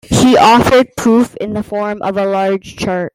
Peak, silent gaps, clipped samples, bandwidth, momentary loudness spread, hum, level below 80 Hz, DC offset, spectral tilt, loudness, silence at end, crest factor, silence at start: 0 dBFS; none; under 0.1%; 16 kHz; 12 LU; none; -38 dBFS; under 0.1%; -5 dB/octave; -12 LUFS; 0.05 s; 12 dB; 0.1 s